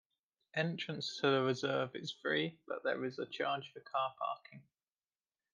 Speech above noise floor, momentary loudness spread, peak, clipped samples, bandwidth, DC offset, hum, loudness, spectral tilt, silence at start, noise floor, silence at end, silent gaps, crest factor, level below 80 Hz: over 52 dB; 9 LU; -18 dBFS; under 0.1%; 9.6 kHz; under 0.1%; none; -38 LUFS; -5 dB/octave; 0.55 s; under -90 dBFS; 0.95 s; none; 20 dB; -86 dBFS